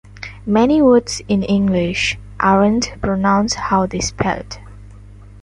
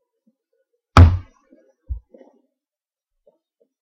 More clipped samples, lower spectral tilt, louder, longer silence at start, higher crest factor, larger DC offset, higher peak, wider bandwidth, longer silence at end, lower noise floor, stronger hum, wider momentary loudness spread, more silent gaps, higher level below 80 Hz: second, under 0.1% vs 0.1%; second, -5 dB/octave vs -7 dB/octave; about the same, -16 LUFS vs -15 LUFS; second, 0.1 s vs 0.95 s; about the same, 16 dB vs 20 dB; neither; about the same, -2 dBFS vs 0 dBFS; first, 11.5 kHz vs 7.8 kHz; second, 0 s vs 1.85 s; second, -38 dBFS vs under -90 dBFS; first, 50 Hz at -30 dBFS vs none; second, 11 LU vs 23 LU; neither; second, -38 dBFS vs -28 dBFS